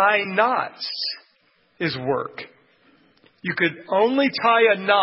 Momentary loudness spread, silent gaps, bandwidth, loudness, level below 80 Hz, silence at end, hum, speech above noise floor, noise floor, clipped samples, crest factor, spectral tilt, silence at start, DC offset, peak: 15 LU; none; 5.8 kHz; -21 LUFS; -66 dBFS; 0 s; none; 42 dB; -62 dBFS; under 0.1%; 18 dB; -8.5 dB/octave; 0 s; under 0.1%; -4 dBFS